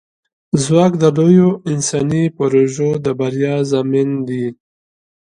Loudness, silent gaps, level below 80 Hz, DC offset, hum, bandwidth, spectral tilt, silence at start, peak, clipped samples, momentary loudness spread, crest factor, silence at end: -15 LUFS; none; -52 dBFS; under 0.1%; none; 11 kHz; -6.5 dB/octave; 0.55 s; 0 dBFS; under 0.1%; 9 LU; 16 dB; 0.85 s